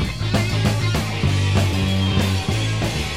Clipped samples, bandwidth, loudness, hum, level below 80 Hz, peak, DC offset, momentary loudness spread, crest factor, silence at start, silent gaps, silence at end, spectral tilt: under 0.1%; 15.5 kHz; -20 LUFS; none; -32 dBFS; -6 dBFS; 1%; 3 LU; 14 dB; 0 s; none; 0 s; -5.5 dB/octave